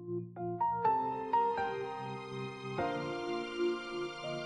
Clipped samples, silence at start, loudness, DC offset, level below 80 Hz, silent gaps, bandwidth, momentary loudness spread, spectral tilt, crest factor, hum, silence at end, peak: under 0.1%; 0 s; -36 LUFS; under 0.1%; -68 dBFS; none; 10.5 kHz; 10 LU; -6 dB/octave; 16 dB; none; 0 s; -20 dBFS